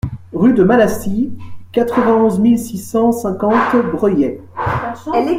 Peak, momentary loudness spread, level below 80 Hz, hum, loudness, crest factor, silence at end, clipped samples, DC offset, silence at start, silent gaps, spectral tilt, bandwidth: 0 dBFS; 9 LU; -42 dBFS; none; -15 LUFS; 14 dB; 0 s; under 0.1%; under 0.1%; 0.05 s; none; -7 dB/octave; 16 kHz